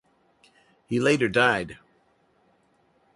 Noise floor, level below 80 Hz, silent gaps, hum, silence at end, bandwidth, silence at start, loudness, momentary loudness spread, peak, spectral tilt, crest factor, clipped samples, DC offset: -65 dBFS; -60 dBFS; none; none; 1.4 s; 11.5 kHz; 0.9 s; -23 LUFS; 10 LU; -6 dBFS; -5 dB/octave; 22 dB; under 0.1%; under 0.1%